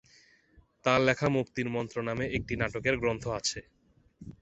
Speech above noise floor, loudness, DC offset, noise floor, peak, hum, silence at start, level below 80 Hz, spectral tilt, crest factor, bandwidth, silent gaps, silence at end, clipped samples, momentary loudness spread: 33 dB; -30 LUFS; under 0.1%; -63 dBFS; -8 dBFS; none; 0.85 s; -52 dBFS; -5 dB/octave; 24 dB; 8.4 kHz; none; 0.1 s; under 0.1%; 8 LU